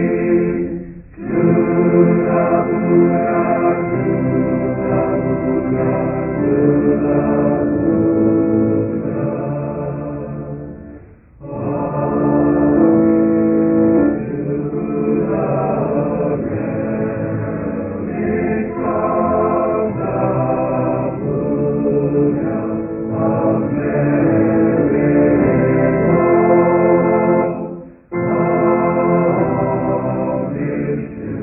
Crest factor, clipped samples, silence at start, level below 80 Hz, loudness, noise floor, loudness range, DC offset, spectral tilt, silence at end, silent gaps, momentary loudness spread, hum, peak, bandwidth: 14 dB; under 0.1%; 0 s; -42 dBFS; -16 LUFS; -40 dBFS; 5 LU; under 0.1%; -16 dB/octave; 0 s; none; 9 LU; none; -2 dBFS; 2.9 kHz